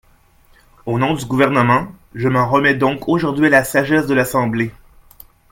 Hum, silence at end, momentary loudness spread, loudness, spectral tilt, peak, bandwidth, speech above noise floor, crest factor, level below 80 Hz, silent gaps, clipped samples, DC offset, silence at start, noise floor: none; 0.8 s; 9 LU; -16 LUFS; -6 dB/octave; 0 dBFS; 17 kHz; 36 dB; 18 dB; -46 dBFS; none; under 0.1%; under 0.1%; 0.85 s; -51 dBFS